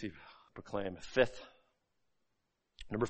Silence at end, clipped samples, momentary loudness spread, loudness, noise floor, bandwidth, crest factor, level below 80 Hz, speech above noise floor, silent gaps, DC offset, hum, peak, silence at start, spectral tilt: 0 s; under 0.1%; 24 LU; -37 LUFS; -83 dBFS; 8.4 kHz; 26 dB; -60 dBFS; 47 dB; none; under 0.1%; none; -14 dBFS; 0 s; -5.5 dB/octave